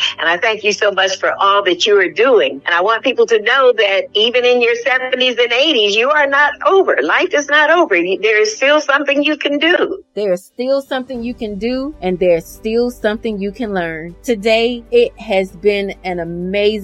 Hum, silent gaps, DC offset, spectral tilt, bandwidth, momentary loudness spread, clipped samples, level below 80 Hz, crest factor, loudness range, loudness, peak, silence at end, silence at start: none; none; under 0.1%; -3.5 dB/octave; 13.5 kHz; 9 LU; under 0.1%; -46 dBFS; 14 dB; 6 LU; -14 LUFS; 0 dBFS; 0 s; 0 s